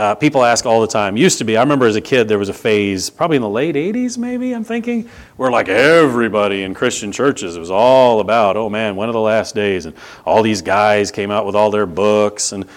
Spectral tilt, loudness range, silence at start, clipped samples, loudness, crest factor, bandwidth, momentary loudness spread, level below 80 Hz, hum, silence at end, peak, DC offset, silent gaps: -4.5 dB/octave; 3 LU; 0 s; under 0.1%; -15 LUFS; 14 dB; 17 kHz; 9 LU; -52 dBFS; none; 0.1 s; 0 dBFS; under 0.1%; none